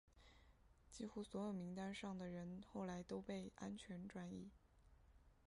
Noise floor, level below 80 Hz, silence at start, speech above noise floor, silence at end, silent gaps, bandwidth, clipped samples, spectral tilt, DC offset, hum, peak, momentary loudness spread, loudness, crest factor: -71 dBFS; -72 dBFS; 0.05 s; 20 dB; 0.1 s; none; 11 kHz; under 0.1%; -6 dB/octave; under 0.1%; none; -36 dBFS; 6 LU; -52 LUFS; 16 dB